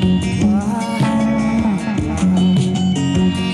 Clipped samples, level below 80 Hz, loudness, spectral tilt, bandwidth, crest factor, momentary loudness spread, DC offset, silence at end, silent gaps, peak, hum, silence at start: under 0.1%; -36 dBFS; -16 LUFS; -6.5 dB/octave; 11.5 kHz; 10 dB; 3 LU; under 0.1%; 0 s; none; -4 dBFS; none; 0 s